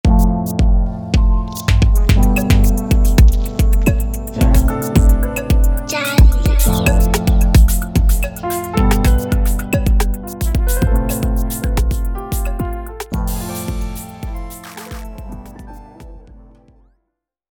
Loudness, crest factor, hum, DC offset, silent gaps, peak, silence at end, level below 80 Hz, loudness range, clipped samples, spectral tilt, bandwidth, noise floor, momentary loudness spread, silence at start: -16 LUFS; 14 dB; none; under 0.1%; none; 0 dBFS; 1.3 s; -16 dBFS; 12 LU; under 0.1%; -6 dB/octave; 19 kHz; -73 dBFS; 16 LU; 0.05 s